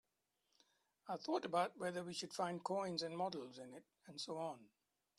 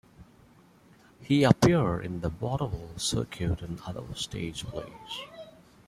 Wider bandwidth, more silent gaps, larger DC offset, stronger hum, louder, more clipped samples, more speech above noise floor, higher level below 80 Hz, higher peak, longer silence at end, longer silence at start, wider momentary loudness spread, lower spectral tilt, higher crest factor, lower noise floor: second, 13 kHz vs 15 kHz; neither; neither; neither; second, -44 LUFS vs -29 LUFS; neither; first, 42 dB vs 29 dB; second, -88 dBFS vs -48 dBFS; second, -26 dBFS vs -4 dBFS; about the same, 0.5 s vs 0.4 s; first, 1.05 s vs 0.2 s; about the same, 16 LU vs 17 LU; about the same, -4.5 dB/octave vs -5.5 dB/octave; second, 20 dB vs 26 dB; first, -86 dBFS vs -58 dBFS